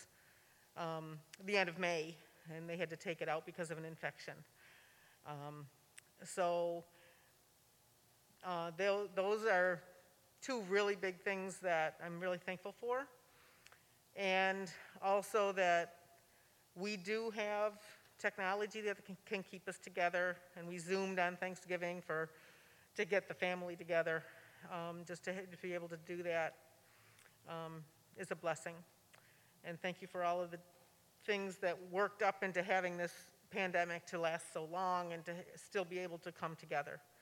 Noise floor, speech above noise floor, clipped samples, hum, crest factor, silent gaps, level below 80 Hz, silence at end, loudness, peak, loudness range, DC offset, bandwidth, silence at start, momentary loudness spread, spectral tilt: -71 dBFS; 30 dB; under 0.1%; none; 22 dB; none; -90 dBFS; 0.2 s; -41 LUFS; -20 dBFS; 7 LU; under 0.1%; 18 kHz; 0 s; 15 LU; -4.5 dB/octave